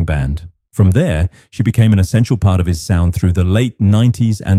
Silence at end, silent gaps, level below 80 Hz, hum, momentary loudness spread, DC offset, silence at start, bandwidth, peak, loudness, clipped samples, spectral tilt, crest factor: 0 s; none; -28 dBFS; none; 7 LU; under 0.1%; 0 s; 14 kHz; -2 dBFS; -14 LUFS; under 0.1%; -7.5 dB/octave; 12 dB